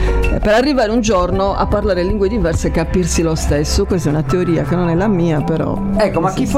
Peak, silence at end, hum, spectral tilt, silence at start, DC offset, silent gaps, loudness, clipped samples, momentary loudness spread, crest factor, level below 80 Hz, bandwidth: -2 dBFS; 0 s; none; -6 dB/octave; 0 s; under 0.1%; none; -15 LUFS; under 0.1%; 3 LU; 12 dB; -22 dBFS; 15.5 kHz